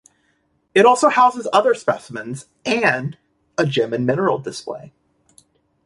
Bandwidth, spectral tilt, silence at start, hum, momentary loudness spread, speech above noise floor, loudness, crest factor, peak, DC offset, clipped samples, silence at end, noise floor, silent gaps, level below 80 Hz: 11.5 kHz; -5 dB/octave; 0.75 s; none; 17 LU; 47 dB; -18 LUFS; 18 dB; -2 dBFS; under 0.1%; under 0.1%; 1.05 s; -65 dBFS; none; -64 dBFS